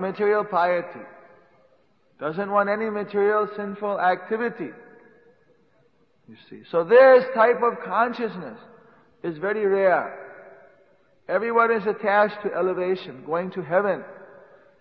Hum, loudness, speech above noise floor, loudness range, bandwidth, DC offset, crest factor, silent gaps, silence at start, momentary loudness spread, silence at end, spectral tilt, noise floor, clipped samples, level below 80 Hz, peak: none; -22 LUFS; 41 dB; 6 LU; 5.4 kHz; under 0.1%; 20 dB; none; 0 s; 16 LU; 0.55 s; -8.5 dB/octave; -63 dBFS; under 0.1%; -76 dBFS; -2 dBFS